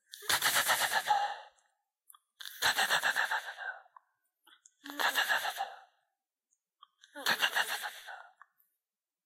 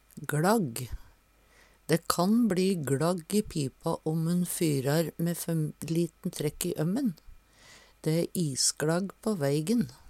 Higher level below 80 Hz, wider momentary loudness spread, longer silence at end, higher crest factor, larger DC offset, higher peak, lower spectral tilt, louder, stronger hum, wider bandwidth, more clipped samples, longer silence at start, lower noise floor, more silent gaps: second, -80 dBFS vs -56 dBFS; first, 20 LU vs 8 LU; first, 1.05 s vs 0 s; about the same, 24 dB vs 24 dB; neither; second, -12 dBFS vs -4 dBFS; second, 1 dB/octave vs -5 dB/octave; about the same, -31 LUFS vs -29 LUFS; neither; about the same, 16 kHz vs 16.5 kHz; neither; about the same, 0.15 s vs 0.15 s; first, under -90 dBFS vs -62 dBFS; neither